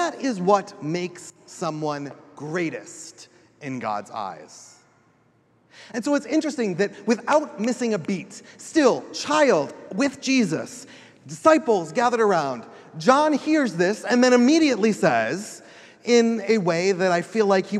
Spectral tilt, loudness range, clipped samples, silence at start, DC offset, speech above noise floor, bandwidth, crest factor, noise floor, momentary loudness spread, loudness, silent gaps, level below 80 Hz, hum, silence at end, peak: -5 dB/octave; 11 LU; under 0.1%; 0 s; under 0.1%; 39 dB; 12.5 kHz; 22 dB; -61 dBFS; 18 LU; -22 LUFS; none; -74 dBFS; none; 0 s; -2 dBFS